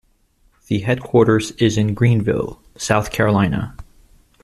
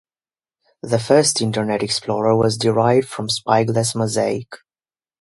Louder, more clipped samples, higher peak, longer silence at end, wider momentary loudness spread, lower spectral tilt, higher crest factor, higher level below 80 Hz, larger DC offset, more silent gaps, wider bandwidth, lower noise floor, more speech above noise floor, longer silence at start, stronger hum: about the same, -18 LUFS vs -18 LUFS; neither; about the same, 0 dBFS vs 0 dBFS; about the same, 0.6 s vs 0.65 s; about the same, 10 LU vs 8 LU; first, -6 dB/octave vs -4.5 dB/octave; about the same, 18 dB vs 20 dB; first, -42 dBFS vs -56 dBFS; neither; neither; first, 13.5 kHz vs 11.5 kHz; second, -58 dBFS vs under -90 dBFS; second, 41 dB vs over 72 dB; second, 0.7 s vs 0.85 s; neither